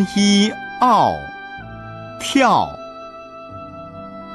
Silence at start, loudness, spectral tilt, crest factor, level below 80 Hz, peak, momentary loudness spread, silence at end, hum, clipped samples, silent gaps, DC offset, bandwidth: 0 s; -16 LUFS; -4.5 dB/octave; 16 dB; -50 dBFS; -4 dBFS; 20 LU; 0 s; none; under 0.1%; none; under 0.1%; 12.5 kHz